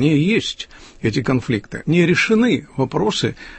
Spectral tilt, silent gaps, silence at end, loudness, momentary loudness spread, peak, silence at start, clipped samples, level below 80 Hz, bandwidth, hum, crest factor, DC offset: -6 dB/octave; none; 0 s; -18 LUFS; 10 LU; -4 dBFS; 0 s; under 0.1%; -46 dBFS; 8.8 kHz; none; 14 dB; under 0.1%